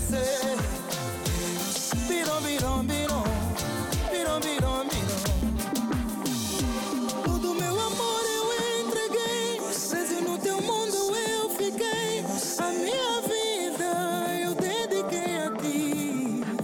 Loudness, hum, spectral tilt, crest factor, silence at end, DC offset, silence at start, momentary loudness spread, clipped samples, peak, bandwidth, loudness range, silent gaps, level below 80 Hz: -28 LUFS; none; -4 dB/octave; 10 dB; 0 s; under 0.1%; 0 s; 3 LU; under 0.1%; -16 dBFS; 19 kHz; 1 LU; none; -40 dBFS